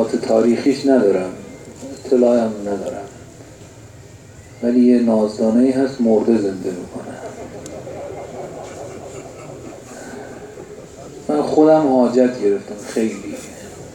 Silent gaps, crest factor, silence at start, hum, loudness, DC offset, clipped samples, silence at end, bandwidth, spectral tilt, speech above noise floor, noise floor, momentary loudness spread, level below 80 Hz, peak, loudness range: none; 18 dB; 0 s; none; -16 LUFS; under 0.1%; under 0.1%; 0 s; 11.5 kHz; -6.5 dB/octave; 24 dB; -40 dBFS; 21 LU; -54 dBFS; -2 dBFS; 15 LU